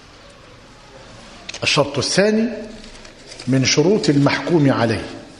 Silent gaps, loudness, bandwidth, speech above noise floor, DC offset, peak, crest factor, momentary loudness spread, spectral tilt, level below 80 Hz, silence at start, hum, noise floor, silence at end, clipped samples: none; -17 LUFS; 11 kHz; 27 dB; under 0.1%; -2 dBFS; 18 dB; 20 LU; -4.5 dB/octave; -48 dBFS; 0.95 s; none; -43 dBFS; 0.05 s; under 0.1%